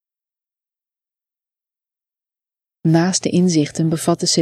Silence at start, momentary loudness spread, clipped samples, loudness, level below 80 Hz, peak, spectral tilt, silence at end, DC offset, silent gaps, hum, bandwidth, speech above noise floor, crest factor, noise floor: 2.85 s; 4 LU; under 0.1%; -17 LUFS; -60 dBFS; -2 dBFS; -5 dB/octave; 0 s; under 0.1%; none; none; 13.5 kHz; over 74 dB; 18 dB; under -90 dBFS